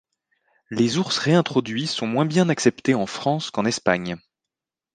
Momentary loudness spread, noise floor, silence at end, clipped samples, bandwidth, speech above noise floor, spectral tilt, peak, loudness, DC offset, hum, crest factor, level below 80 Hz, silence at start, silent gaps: 6 LU; -87 dBFS; 0.75 s; under 0.1%; 9.8 kHz; 66 dB; -5 dB/octave; -2 dBFS; -22 LUFS; under 0.1%; none; 22 dB; -62 dBFS; 0.7 s; none